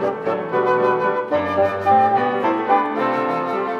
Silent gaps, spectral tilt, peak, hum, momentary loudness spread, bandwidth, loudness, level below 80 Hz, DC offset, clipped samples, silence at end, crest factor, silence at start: none; -7 dB/octave; -4 dBFS; none; 6 LU; 7.2 kHz; -19 LUFS; -64 dBFS; under 0.1%; under 0.1%; 0 s; 14 dB; 0 s